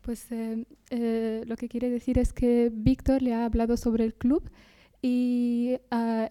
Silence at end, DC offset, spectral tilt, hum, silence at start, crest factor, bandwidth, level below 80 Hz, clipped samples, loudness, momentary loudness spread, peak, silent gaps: 0 s; under 0.1%; -7.5 dB/octave; none; 0.05 s; 16 dB; 13.5 kHz; -40 dBFS; under 0.1%; -27 LUFS; 9 LU; -10 dBFS; none